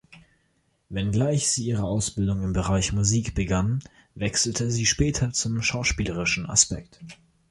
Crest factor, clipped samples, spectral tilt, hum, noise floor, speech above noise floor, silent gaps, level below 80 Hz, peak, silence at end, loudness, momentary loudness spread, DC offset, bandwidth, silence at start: 22 dB; under 0.1%; -4 dB/octave; none; -69 dBFS; 44 dB; none; -40 dBFS; -4 dBFS; 0.35 s; -24 LUFS; 7 LU; under 0.1%; 11.5 kHz; 0.1 s